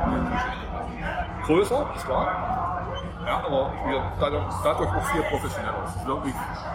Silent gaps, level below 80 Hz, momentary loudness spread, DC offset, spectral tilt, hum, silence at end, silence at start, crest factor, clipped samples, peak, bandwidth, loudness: none; -38 dBFS; 7 LU; under 0.1%; -6 dB/octave; none; 0 s; 0 s; 18 dB; under 0.1%; -8 dBFS; 16 kHz; -27 LUFS